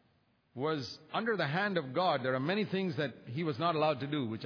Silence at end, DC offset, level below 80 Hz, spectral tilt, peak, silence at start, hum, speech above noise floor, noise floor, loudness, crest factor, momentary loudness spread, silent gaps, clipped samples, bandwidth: 0 s; under 0.1%; -80 dBFS; -4 dB/octave; -18 dBFS; 0.55 s; none; 38 dB; -72 dBFS; -34 LUFS; 16 dB; 7 LU; none; under 0.1%; 5.4 kHz